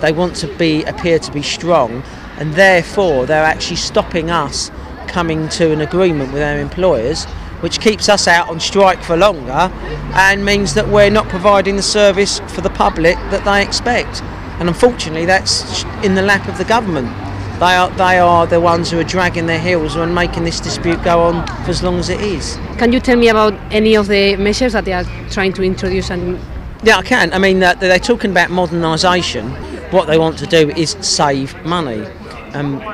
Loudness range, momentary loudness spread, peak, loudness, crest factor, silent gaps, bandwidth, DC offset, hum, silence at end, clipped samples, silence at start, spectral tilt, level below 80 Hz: 3 LU; 10 LU; 0 dBFS; -13 LUFS; 14 dB; none; 15.5 kHz; under 0.1%; none; 0 s; under 0.1%; 0 s; -4.5 dB/octave; -30 dBFS